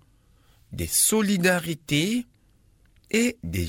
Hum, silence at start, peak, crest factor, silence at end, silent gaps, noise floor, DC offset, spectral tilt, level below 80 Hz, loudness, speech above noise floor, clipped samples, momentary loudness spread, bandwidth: none; 0.7 s; -8 dBFS; 18 dB; 0 s; none; -60 dBFS; under 0.1%; -3.5 dB/octave; -48 dBFS; -23 LUFS; 36 dB; under 0.1%; 13 LU; 18 kHz